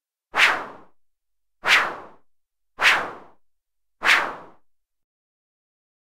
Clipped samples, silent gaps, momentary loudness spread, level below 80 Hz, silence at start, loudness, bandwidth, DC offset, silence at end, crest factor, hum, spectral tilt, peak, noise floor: under 0.1%; none; 19 LU; -64 dBFS; 0.35 s; -20 LUFS; 16 kHz; under 0.1%; 1.6 s; 24 dB; none; 0 dB/octave; -2 dBFS; -74 dBFS